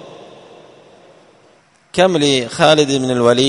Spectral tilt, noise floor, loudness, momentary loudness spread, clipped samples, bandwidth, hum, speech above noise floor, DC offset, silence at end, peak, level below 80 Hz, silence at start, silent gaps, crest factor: -4.5 dB/octave; -52 dBFS; -14 LUFS; 4 LU; under 0.1%; 11 kHz; none; 39 dB; under 0.1%; 0 s; 0 dBFS; -54 dBFS; 0 s; none; 16 dB